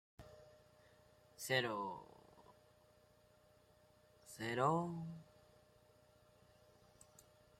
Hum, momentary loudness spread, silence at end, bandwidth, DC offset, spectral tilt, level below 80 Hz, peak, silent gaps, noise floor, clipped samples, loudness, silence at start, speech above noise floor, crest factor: none; 27 LU; 2.35 s; 16 kHz; under 0.1%; -4.5 dB/octave; -78 dBFS; -20 dBFS; none; -70 dBFS; under 0.1%; -41 LUFS; 0.2 s; 30 dB; 26 dB